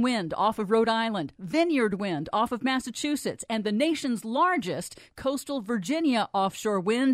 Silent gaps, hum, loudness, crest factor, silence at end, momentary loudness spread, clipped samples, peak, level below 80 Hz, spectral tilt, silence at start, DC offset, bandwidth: none; none; -27 LUFS; 16 dB; 0 s; 7 LU; under 0.1%; -10 dBFS; -62 dBFS; -4.5 dB/octave; 0 s; under 0.1%; 15.5 kHz